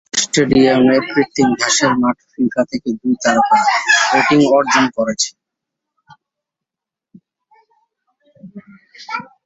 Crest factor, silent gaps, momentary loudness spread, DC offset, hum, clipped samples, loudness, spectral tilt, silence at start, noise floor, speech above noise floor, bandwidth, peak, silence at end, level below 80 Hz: 16 dB; none; 9 LU; under 0.1%; none; under 0.1%; -14 LUFS; -3.5 dB/octave; 0.15 s; -86 dBFS; 71 dB; 8 kHz; -2 dBFS; 0.2 s; -52 dBFS